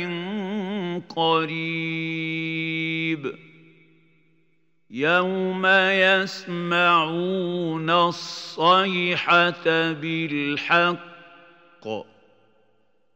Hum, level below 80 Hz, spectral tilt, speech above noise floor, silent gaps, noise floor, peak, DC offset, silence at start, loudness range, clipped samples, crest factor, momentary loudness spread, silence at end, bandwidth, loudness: none; -76 dBFS; -5.5 dB/octave; 47 dB; none; -69 dBFS; -4 dBFS; under 0.1%; 0 s; 6 LU; under 0.1%; 20 dB; 12 LU; 1.15 s; 15.5 kHz; -22 LUFS